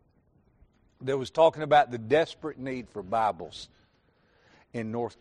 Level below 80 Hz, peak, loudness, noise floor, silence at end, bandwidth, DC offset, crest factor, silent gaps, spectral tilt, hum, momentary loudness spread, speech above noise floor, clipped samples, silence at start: -64 dBFS; -8 dBFS; -27 LUFS; -67 dBFS; 0.1 s; 10.5 kHz; under 0.1%; 20 dB; none; -5.5 dB/octave; none; 17 LU; 40 dB; under 0.1%; 1 s